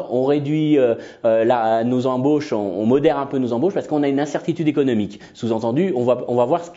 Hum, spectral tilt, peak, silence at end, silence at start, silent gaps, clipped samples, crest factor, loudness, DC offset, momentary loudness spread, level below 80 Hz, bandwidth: none; -7.5 dB/octave; -4 dBFS; 0.05 s; 0 s; none; under 0.1%; 16 dB; -19 LUFS; under 0.1%; 6 LU; -62 dBFS; 7.8 kHz